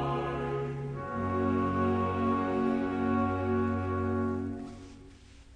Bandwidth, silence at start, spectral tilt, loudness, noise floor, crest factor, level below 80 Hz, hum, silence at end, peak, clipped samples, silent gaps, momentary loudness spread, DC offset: 9.6 kHz; 0 s; -8.5 dB/octave; -31 LUFS; -52 dBFS; 14 dB; -52 dBFS; none; 0 s; -18 dBFS; under 0.1%; none; 8 LU; under 0.1%